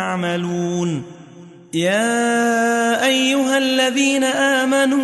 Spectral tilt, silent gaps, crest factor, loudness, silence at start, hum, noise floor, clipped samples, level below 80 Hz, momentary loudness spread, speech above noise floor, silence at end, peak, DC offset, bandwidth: -3.5 dB/octave; none; 14 dB; -17 LUFS; 0 s; none; -41 dBFS; under 0.1%; -64 dBFS; 6 LU; 24 dB; 0 s; -4 dBFS; under 0.1%; 12 kHz